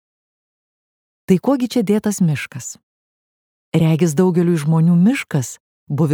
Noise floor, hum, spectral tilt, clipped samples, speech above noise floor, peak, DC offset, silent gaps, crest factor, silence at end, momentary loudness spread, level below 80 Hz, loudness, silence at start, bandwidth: under -90 dBFS; none; -7 dB/octave; under 0.1%; over 74 dB; -2 dBFS; under 0.1%; 2.83-3.72 s, 5.60-5.87 s; 16 dB; 0 s; 12 LU; -58 dBFS; -17 LUFS; 1.3 s; 16.5 kHz